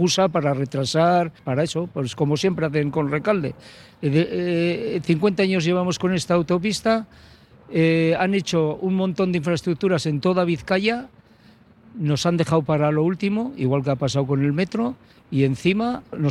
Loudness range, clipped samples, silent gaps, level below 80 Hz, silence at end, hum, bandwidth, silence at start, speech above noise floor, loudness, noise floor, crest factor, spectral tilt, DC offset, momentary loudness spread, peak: 2 LU; under 0.1%; none; -54 dBFS; 0 s; none; 12.5 kHz; 0 s; 31 dB; -22 LUFS; -52 dBFS; 16 dB; -6 dB/octave; under 0.1%; 6 LU; -6 dBFS